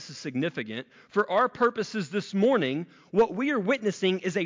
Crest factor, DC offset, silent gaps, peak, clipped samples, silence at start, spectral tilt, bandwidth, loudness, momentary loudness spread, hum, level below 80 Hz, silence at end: 14 dB; under 0.1%; none; -12 dBFS; under 0.1%; 0 s; -5.5 dB/octave; 7.6 kHz; -27 LUFS; 10 LU; none; -70 dBFS; 0 s